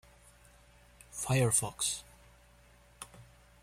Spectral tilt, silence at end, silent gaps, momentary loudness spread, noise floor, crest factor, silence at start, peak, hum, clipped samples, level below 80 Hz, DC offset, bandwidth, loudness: -3.5 dB/octave; 0.4 s; none; 23 LU; -61 dBFS; 22 dB; 1.1 s; -14 dBFS; none; under 0.1%; -60 dBFS; under 0.1%; 16 kHz; -31 LUFS